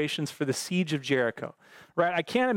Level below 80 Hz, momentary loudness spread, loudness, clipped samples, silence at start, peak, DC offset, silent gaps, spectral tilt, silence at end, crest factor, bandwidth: -74 dBFS; 9 LU; -28 LUFS; under 0.1%; 0 s; -10 dBFS; under 0.1%; none; -4.5 dB/octave; 0 s; 18 dB; 17 kHz